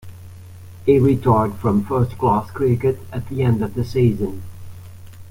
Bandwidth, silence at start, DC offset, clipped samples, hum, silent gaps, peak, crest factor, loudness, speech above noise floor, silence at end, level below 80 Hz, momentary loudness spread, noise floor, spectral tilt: 16 kHz; 0.05 s; under 0.1%; under 0.1%; none; none; -2 dBFS; 16 dB; -19 LUFS; 20 dB; 0 s; -44 dBFS; 19 LU; -38 dBFS; -9 dB/octave